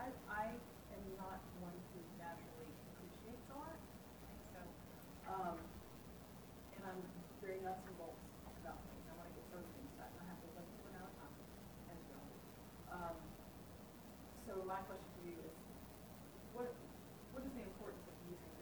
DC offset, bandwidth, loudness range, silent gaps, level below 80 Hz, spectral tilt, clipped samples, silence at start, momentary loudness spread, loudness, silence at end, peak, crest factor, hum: under 0.1%; over 20 kHz; 3 LU; none; -66 dBFS; -5.5 dB/octave; under 0.1%; 0 s; 10 LU; -53 LUFS; 0 s; -32 dBFS; 20 dB; none